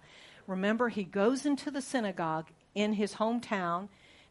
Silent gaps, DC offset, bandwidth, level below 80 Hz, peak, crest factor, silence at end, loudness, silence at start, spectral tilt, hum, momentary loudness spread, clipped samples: none; under 0.1%; 11.5 kHz; -72 dBFS; -16 dBFS; 18 dB; 0.45 s; -32 LUFS; 0.1 s; -5.5 dB/octave; none; 9 LU; under 0.1%